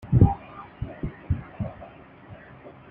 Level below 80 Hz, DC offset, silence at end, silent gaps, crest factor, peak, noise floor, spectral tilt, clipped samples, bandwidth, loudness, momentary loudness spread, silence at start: -38 dBFS; under 0.1%; 0.2 s; none; 22 dB; -4 dBFS; -46 dBFS; -12 dB/octave; under 0.1%; 3.6 kHz; -27 LUFS; 26 LU; 0.05 s